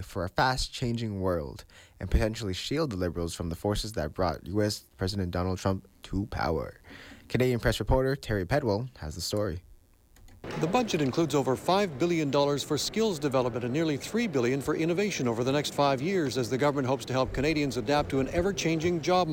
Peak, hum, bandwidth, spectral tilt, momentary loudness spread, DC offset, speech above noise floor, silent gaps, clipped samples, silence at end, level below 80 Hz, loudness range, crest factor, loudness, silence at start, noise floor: -14 dBFS; none; 17 kHz; -5.5 dB/octave; 8 LU; under 0.1%; 29 dB; none; under 0.1%; 0 s; -44 dBFS; 4 LU; 16 dB; -29 LUFS; 0 s; -57 dBFS